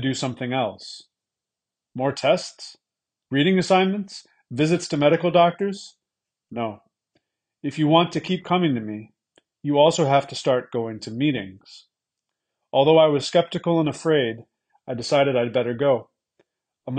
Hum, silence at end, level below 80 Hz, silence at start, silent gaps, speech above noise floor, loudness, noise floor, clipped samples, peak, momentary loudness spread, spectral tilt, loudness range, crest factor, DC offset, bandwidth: none; 0 s; -66 dBFS; 0 s; none; 66 dB; -21 LUFS; -88 dBFS; under 0.1%; -4 dBFS; 19 LU; -5.5 dB/octave; 3 LU; 20 dB; under 0.1%; 9.8 kHz